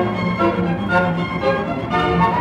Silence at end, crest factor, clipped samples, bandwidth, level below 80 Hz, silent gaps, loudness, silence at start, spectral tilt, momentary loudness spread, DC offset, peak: 0 s; 16 dB; under 0.1%; 8.4 kHz; -38 dBFS; none; -19 LUFS; 0 s; -7.5 dB/octave; 4 LU; under 0.1%; -2 dBFS